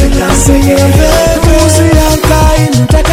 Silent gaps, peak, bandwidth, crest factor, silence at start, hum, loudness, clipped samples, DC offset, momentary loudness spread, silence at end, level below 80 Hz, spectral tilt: none; 0 dBFS; 18.5 kHz; 6 dB; 0 s; none; -7 LUFS; 5%; under 0.1%; 2 LU; 0 s; -12 dBFS; -5 dB/octave